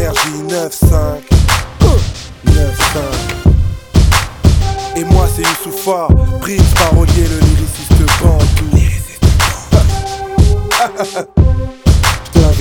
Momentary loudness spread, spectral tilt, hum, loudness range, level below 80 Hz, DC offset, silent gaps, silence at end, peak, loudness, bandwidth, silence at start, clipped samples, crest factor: 6 LU; -5 dB/octave; none; 2 LU; -14 dBFS; under 0.1%; none; 0 s; 0 dBFS; -12 LUFS; 18.5 kHz; 0 s; 0.9%; 10 dB